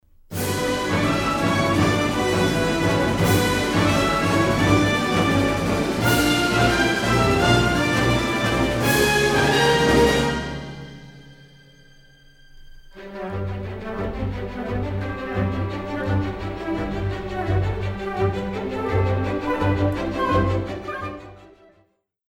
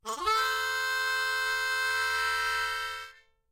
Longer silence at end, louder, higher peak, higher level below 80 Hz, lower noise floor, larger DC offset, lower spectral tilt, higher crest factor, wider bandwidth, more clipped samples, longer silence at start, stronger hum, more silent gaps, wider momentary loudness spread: first, 0.85 s vs 0.4 s; first, -21 LUFS vs -28 LUFS; first, -6 dBFS vs -16 dBFS; first, -38 dBFS vs -64 dBFS; first, -63 dBFS vs -50 dBFS; neither; first, -5 dB/octave vs 0.5 dB/octave; about the same, 16 dB vs 14 dB; first, 19.5 kHz vs 16.5 kHz; neither; first, 0.3 s vs 0.05 s; neither; neither; first, 12 LU vs 7 LU